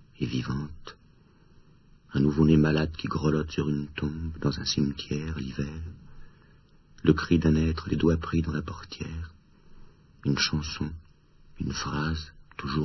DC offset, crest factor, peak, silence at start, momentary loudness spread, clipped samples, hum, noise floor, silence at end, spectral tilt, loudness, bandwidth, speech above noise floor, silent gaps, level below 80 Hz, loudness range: under 0.1%; 22 dB; -6 dBFS; 0.2 s; 16 LU; under 0.1%; none; -57 dBFS; 0 s; -6 dB/octave; -28 LUFS; 6.2 kHz; 30 dB; none; -42 dBFS; 6 LU